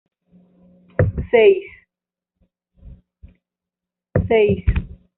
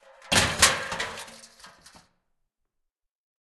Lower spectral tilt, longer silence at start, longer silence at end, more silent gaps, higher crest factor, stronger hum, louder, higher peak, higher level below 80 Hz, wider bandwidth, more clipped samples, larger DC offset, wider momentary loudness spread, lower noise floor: first, -6 dB/octave vs -1 dB/octave; first, 1 s vs 0.25 s; second, 0.3 s vs 1.9 s; neither; second, 18 dB vs 26 dB; neither; first, -18 LUFS vs -23 LUFS; about the same, -2 dBFS vs -4 dBFS; first, -32 dBFS vs -52 dBFS; second, 4 kHz vs 12.5 kHz; neither; neither; second, 14 LU vs 20 LU; first, -88 dBFS vs -81 dBFS